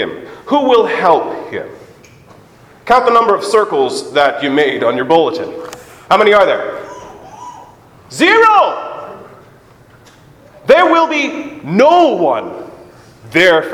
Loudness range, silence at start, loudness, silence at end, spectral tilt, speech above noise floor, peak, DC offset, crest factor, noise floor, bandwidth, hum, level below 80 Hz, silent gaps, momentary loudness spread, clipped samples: 2 LU; 0 s; -11 LUFS; 0 s; -4.5 dB/octave; 32 dB; 0 dBFS; under 0.1%; 14 dB; -43 dBFS; 15.5 kHz; none; -52 dBFS; none; 22 LU; 0.2%